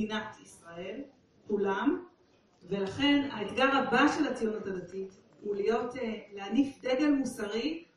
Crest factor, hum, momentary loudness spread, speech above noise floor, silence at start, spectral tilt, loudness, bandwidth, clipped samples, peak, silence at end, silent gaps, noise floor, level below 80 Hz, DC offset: 20 dB; none; 17 LU; 34 dB; 0 s; -5 dB/octave; -31 LUFS; 11.5 kHz; under 0.1%; -12 dBFS; 0.15 s; none; -65 dBFS; -64 dBFS; under 0.1%